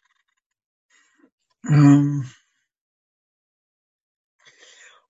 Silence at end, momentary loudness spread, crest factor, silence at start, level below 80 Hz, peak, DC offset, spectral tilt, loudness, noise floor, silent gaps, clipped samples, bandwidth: 2.8 s; 23 LU; 20 dB; 1.65 s; -68 dBFS; -2 dBFS; under 0.1%; -8 dB/octave; -17 LUFS; -74 dBFS; none; under 0.1%; 7.8 kHz